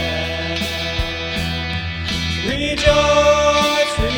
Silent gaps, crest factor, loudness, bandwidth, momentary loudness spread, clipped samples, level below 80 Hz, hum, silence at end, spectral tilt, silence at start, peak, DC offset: none; 18 dB; -17 LUFS; over 20 kHz; 9 LU; under 0.1%; -30 dBFS; none; 0 s; -4 dB/octave; 0 s; 0 dBFS; under 0.1%